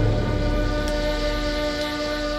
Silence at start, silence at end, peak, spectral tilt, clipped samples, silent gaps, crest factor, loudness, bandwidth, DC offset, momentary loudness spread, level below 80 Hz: 0 s; 0 s; -10 dBFS; -5.5 dB/octave; under 0.1%; none; 14 dB; -24 LUFS; 14 kHz; under 0.1%; 2 LU; -28 dBFS